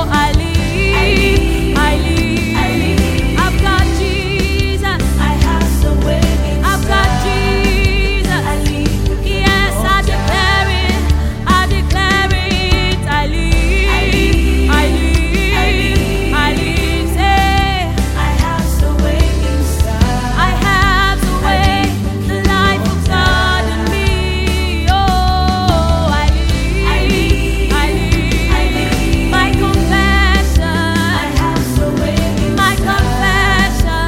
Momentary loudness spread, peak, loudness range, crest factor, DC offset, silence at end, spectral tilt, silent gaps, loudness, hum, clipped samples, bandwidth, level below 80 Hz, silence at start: 4 LU; 0 dBFS; 1 LU; 12 dB; under 0.1%; 0 s; -5 dB/octave; none; -13 LUFS; none; under 0.1%; 16.5 kHz; -16 dBFS; 0 s